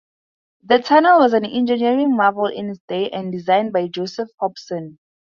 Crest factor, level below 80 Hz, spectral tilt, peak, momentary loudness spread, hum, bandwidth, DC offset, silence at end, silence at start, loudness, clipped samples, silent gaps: 18 dB; -66 dBFS; -6 dB/octave; 0 dBFS; 15 LU; none; 7.2 kHz; under 0.1%; 0.35 s; 0.7 s; -18 LUFS; under 0.1%; 2.80-2.88 s